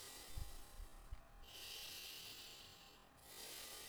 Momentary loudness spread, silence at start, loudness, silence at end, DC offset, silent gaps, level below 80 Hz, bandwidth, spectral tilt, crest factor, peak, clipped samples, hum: 11 LU; 0 s; -54 LUFS; 0 s; under 0.1%; none; -60 dBFS; over 20 kHz; -1.5 dB/octave; 18 dB; -36 dBFS; under 0.1%; none